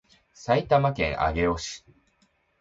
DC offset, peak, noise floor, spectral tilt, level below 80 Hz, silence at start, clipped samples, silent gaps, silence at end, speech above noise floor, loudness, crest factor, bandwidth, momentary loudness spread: under 0.1%; -8 dBFS; -68 dBFS; -5.5 dB/octave; -42 dBFS; 0.4 s; under 0.1%; none; 0.85 s; 43 dB; -25 LUFS; 20 dB; 8 kHz; 16 LU